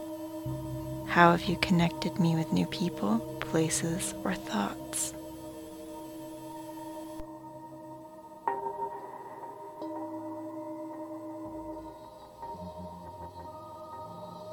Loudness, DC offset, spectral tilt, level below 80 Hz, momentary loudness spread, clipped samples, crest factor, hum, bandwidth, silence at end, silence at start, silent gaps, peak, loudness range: -32 LUFS; under 0.1%; -5 dB/octave; -56 dBFS; 17 LU; under 0.1%; 28 dB; none; 19.5 kHz; 0 s; 0 s; none; -6 dBFS; 15 LU